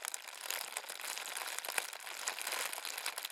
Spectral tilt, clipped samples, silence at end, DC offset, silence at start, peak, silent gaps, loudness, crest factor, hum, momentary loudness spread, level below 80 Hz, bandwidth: 3 dB/octave; under 0.1%; 0 s; under 0.1%; 0 s; -12 dBFS; none; -39 LUFS; 30 dB; none; 4 LU; under -90 dBFS; 18 kHz